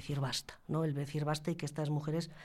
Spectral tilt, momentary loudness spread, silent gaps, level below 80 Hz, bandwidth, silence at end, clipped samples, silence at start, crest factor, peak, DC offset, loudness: -5.5 dB/octave; 3 LU; none; -62 dBFS; 14.5 kHz; 0 s; under 0.1%; 0 s; 16 dB; -22 dBFS; under 0.1%; -37 LUFS